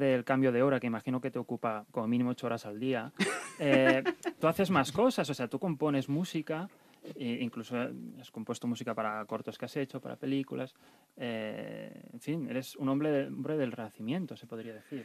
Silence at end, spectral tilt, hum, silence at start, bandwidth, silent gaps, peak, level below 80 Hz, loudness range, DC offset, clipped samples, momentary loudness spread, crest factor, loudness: 0 s; -6 dB/octave; none; 0 s; 14.5 kHz; none; -10 dBFS; -74 dBFS; 8 LU; under 0.1%; under 0.1%; 15 LU; 22 dB; -33 LUFS